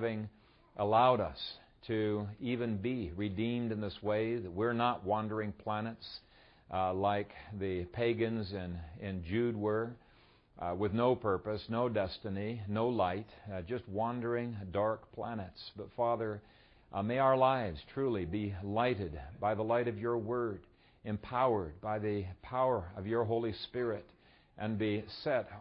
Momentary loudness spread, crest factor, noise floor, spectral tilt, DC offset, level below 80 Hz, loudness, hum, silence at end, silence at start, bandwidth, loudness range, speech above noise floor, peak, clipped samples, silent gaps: 12 LU; 20 dB; -64 dBFS; -5.5 dB/octave; under 0.1%; -60 dBFS; -35 LUFS; none; 0 s; 0 s; 5.4 kHz; 3 LU; 30 dB; -16 dBFS; under 0.1%; none